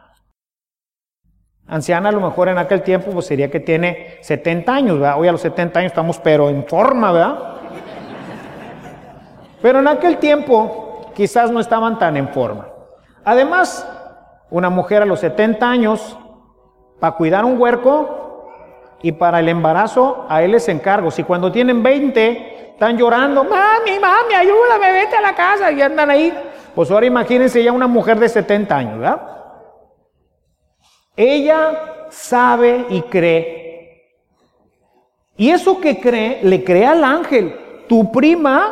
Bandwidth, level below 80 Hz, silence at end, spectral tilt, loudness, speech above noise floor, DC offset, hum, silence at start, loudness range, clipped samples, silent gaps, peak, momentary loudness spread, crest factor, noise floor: 13.5 kHz; -54 dBFS; 0 s; -6 dB/octave; -14 LUFS; over 76 dB; under 0.1%; none; 1.7 s; 5 LU; under 0.1%; none; 0 dBFS; 15 LU; 14 dB; under -90 dBFS